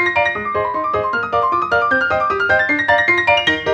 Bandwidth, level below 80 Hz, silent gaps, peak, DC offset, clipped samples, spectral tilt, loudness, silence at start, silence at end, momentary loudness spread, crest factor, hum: 9.4 kHz; -46 dBFS; none; -2 dBFS; under 0.1%; under 0.1%; -4.5 dB/octave; -15 LUFS; 0 s; 0 s; 6 LU; 14 dB; none